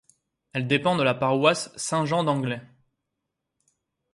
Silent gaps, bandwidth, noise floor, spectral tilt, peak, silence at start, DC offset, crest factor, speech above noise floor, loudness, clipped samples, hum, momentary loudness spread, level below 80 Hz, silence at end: none; 11.5 kHz; -82 dBFS; -5 dB/octave; -4 dBFS; 0.55 s; under 0.1%; 22 dB; 58 dB; -24 LUFS; under 0.1%; none; 10 LU; -66 dBFS; 1.5 s